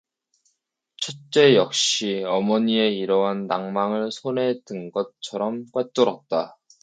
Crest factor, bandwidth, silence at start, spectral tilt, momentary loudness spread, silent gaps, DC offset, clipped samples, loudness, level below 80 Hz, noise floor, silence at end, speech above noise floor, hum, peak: 20 dB; 9.4 kHz; 1 s; -4 dB/octave; 12 LU; none; under 0.1%; under 0.1%; -22 LUFS; -74 dBFS; -75 dBFS; 0.3 s; 53 dB; none; -2 dBFS